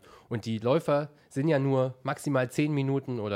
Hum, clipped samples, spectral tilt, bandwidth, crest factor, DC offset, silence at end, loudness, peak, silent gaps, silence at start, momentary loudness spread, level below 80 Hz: none; under 0.1%; -7 dB/octave; 15 kHz; 16 dB; under 0.1%; 0 s; -29 LUFS; -12 dBFS; none; 0.3 s; 8 LU; -70 dBFS